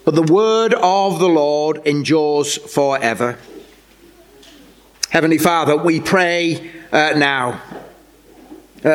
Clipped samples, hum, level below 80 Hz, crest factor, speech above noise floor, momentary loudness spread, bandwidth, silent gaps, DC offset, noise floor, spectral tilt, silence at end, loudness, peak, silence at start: under 0.1%; none; -56 dBFS; 16 dB; 31 dB; 10 LU; 17 kHz; none; under 0.1%; -47 dBFS; -4.5 dB/octave; 0 s; -16 LUFS; 0 dBFS; 0.05 s